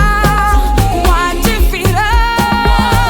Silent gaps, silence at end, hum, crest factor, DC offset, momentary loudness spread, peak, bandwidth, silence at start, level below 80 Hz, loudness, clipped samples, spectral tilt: none; 0 s; none; 10 dB; under 0.1%; 2 LU; 0 dBFS; over 20 kHz; 0 s; -14 dBFS; -12 LUFS; under 0.1%; -5 dB/octave